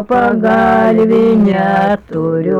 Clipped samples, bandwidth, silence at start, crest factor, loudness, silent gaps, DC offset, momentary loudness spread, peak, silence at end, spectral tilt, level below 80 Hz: under 0.1%; 7 kHz; 0 s; 6 dB; -11 LUFS; none; under 0.1%; 6 LU; -4 dBFS; 0 s; -8.5 dB/octave; -42 dBFS